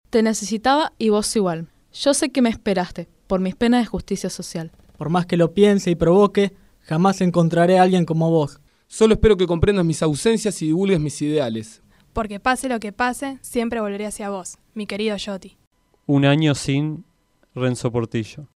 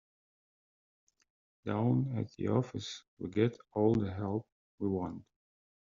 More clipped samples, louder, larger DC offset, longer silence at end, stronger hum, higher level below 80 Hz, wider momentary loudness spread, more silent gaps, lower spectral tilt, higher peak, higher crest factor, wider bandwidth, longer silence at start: neither; first, -20 LUFS vs -34 LUFS; neither; second, 0.1 s vs 0.65 s; neither; first, -42 dBFS vs -68 dBFS; about the same, 15 LU vs 13 LU; second, 15.67-15.71 s vs 3.08-3.17 s, 4.52-4.78 s; second, -5.5 dB/octave vs -7.5 dB/octave; first, -2 dBFS vs -16 dBFS; about the same, 18 dB vs 20 dB; first, 14 kHz vs 7.4 kHz; second, 0.15 s vs 1.65 s